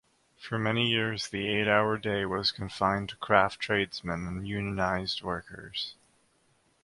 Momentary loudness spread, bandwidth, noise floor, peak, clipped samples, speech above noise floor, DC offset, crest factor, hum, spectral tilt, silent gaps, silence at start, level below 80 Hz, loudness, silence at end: 11 LU; 11.5 kHz; -69 dBFS; -6 dBFS; under 0.1%; 39 dB; under 0.1%; 26 dB; none; -5 dB/octave; none; 0.4 s; -54 dBFS; -29 LUFS; 0.9 s